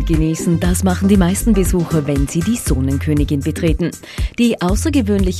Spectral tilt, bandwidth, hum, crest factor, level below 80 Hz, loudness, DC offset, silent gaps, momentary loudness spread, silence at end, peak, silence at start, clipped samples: -6 dB/octave; 14 kHz; none; 16 dB; -24 dBFS; -16 LUFS; under 0.1%; none; 5 LU; 0 s; 0 dBFS; 0 s; under 0.1%